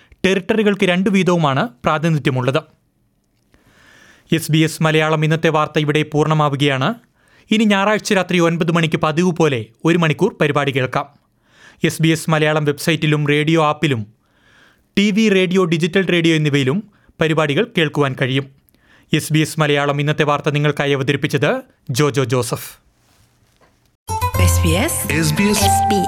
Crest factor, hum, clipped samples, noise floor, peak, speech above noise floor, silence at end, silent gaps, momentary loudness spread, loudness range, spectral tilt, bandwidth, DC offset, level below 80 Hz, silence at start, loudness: 16 dB; none; under 0.1%; -62 dBFS; -2 dBFS; 46 dB; 0 s; 23.95-24.06 s; 7 LU; 3 LU; -5.5 dB/octave; 18 kHz; under 0.1%; -46 dBFS; 0.25 s; -16 LUFS